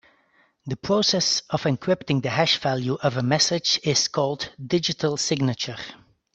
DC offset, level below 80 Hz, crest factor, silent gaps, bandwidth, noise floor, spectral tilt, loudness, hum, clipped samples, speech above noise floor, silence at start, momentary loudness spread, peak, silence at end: under 0.1%; -60 dBFS; 20 dB; none; 8.4 kHz; -63 dBFS; -4 dB/octave; -23 LUFS; none; under 0.1%; 39 dB; 0.65 s; 11 LU; -4 dBFS; 0.4 s